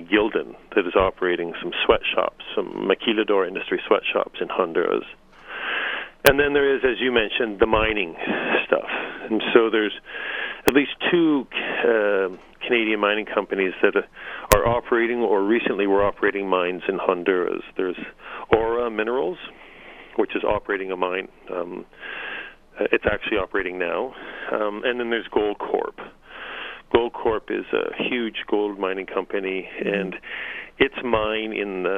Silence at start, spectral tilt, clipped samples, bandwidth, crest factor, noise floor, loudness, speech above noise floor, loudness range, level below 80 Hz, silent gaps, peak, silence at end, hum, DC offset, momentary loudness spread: 0 s; -4.5 dB/octave; under 0.1%; 15.5 kHz; 22 dB; -44 dBFS; -23 LUFS; 21 dB; 5 LU; -44 dBFS; none; 0 dBFS; 0 s; none; under 0.1%; 12 LU